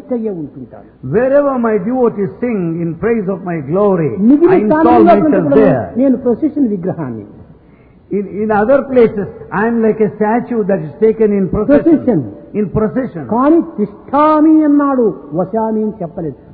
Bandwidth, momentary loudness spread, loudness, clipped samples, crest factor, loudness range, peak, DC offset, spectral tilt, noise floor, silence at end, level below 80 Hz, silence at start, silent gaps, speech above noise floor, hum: 4.7 kHz; 12 LU; -13 LUFS; under 0.1%; 12 dB; 5 LU; 0 dBFS; under 0.1%; -12.5 dB/octave; -43 dBFS; 0 s; -42 dBFS; 0.05 s; none; 31 dB; none